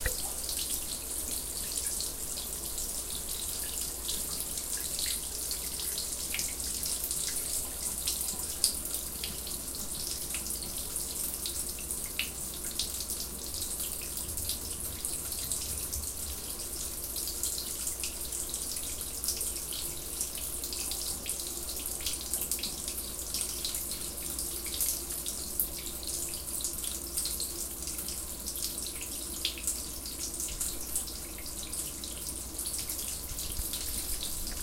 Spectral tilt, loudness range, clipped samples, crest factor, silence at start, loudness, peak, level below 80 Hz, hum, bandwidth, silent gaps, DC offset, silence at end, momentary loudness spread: -1 dB/octave; 3 LU; under 0.1%; 30 dB; 0 s; -33 LUFS; -4 dBFS; -48 dBFS; none; 17 kHz; none; under 0.1%; 0 s; 4 LU